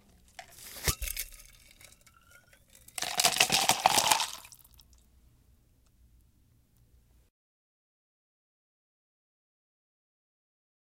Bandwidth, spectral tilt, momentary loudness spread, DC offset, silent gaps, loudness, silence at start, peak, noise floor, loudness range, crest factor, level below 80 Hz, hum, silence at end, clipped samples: 17 kHz; -0.5 dB/octave; 23 LU; under 0.1%; none; -27 LUFS; 0.4 s; -4 dBFS; -66 dBFS; 8 LU; 32 dB; -54 dBFS; none; 6.5 s; under 0.1%